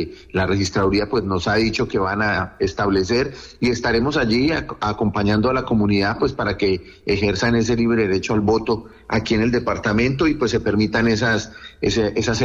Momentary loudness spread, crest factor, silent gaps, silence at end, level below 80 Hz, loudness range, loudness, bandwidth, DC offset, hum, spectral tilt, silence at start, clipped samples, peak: 6 LU; 12 dB; none; 0 s; -38 dBFS; 1 LU; -20 LUFS; 8 kHz; under 0.1%; none; -5.5 dB/octave; 0 s; under 0.1%; -8 dBFS